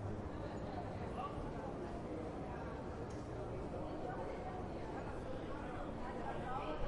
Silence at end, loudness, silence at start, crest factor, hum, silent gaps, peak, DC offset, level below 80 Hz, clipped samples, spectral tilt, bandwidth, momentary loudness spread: 0 s; -46 LUFS; 0 s; 16 dB; none; none; -28 dBFS; under 0.1%; -52 dBFS; under 0.1%; -7.5 dB/octave; 11 kHz; 2 LU